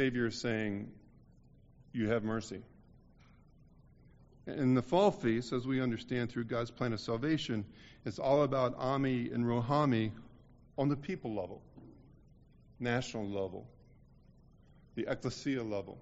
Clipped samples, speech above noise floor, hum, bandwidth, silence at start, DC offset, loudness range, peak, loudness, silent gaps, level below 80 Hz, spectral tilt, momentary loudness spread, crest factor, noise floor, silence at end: under 0.1%; 28 dB; none; 7.6 kHz; 0 s; under 0.1%; 8 LU; -14 dBFS; -35 LUFS; none; -62 dBFS; -6 dB/octave; 16 LU; 20 dB; -61 dBFS; 0 s